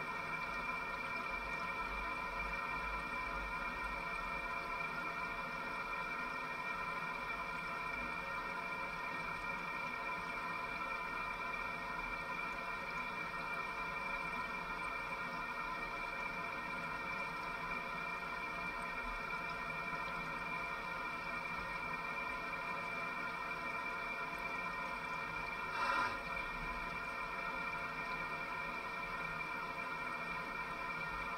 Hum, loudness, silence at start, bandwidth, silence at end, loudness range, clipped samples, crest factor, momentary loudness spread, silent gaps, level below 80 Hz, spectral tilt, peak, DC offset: none; -41 LUFS; 0 s; 16 kHz; 0 s; 1 LU; under 0.1%; 18 dB; 1 LU; none; -58 dBFS; -4 dB/octave; -24 dBFS; under 0.1%